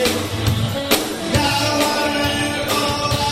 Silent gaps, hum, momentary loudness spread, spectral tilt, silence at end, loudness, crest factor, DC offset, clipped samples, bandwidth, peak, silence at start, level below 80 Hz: none; none; 3 LU; -4 dB/octave; 0 s; -18 LUFS; 18 dB; under 0.1%; under 0.1%; 16.5 kHz; -2 dBFS; 0 s; -38 dBFS